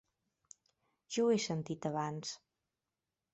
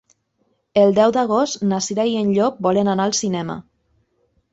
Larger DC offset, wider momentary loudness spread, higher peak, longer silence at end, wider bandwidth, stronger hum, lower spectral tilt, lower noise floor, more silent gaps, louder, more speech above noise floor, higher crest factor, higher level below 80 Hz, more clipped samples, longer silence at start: neither; first, 12 LU vs 9 LU; second, -22 dBFS vs -2 dBFS; about the same, 0.95 s vs 0.9 s; about the same, 8.2 kHz vs 8 kHz; neither; about the same, -5 dB/octave vs -5 dB/octave; first, under -90 dBFS vs -67 dBFS; neither; second, -36 LUFS vs -18 LUFS; first, over 55 dB vs 49 dB; about the same, 18 dB vs 16 dB; second, -78 dBFS vs -58 dBFS; neither; first, 1.1 s vs 0.75 s